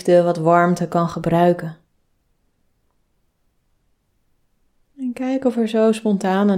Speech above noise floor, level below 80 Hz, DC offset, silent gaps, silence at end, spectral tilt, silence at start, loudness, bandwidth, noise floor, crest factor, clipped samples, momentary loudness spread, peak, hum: 48 dB; -56 dBFS; under 0.1%; none; 0 s; -7.5 dB/octave; 0.05 s; -18 LUFS; 14.5 kHz; -65 dBFS; 18 dB; under 0.1%; 10 LU; -2 dBFS; none